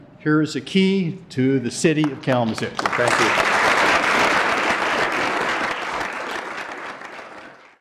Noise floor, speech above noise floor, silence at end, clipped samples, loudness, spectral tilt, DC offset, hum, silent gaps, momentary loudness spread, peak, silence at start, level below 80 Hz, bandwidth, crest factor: -42 dBFS; 22 dB; 0.25 s; under 0.1%; -20 LUFS; -4.5 dB/octave; under 0.1%; none; none; 14 LU; -6 dBFS; 0 s; -54 dBFS; 15 kHz; 14 dB